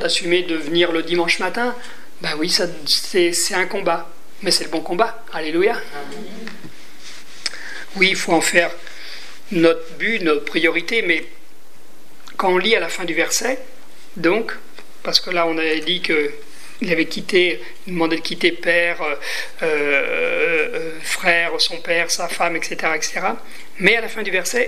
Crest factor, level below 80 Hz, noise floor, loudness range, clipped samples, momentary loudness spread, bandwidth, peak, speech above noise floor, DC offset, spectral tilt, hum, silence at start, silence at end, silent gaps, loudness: 20 dB; -72 dBFS; -50 dBFS; 3 LU; under 0.1%; 16 LU; 15.5 kHz; 0 dBFS; 30 dB; 5%; -2.5 dB/octave; none; 0 s; 0 s; none; -19 LUFS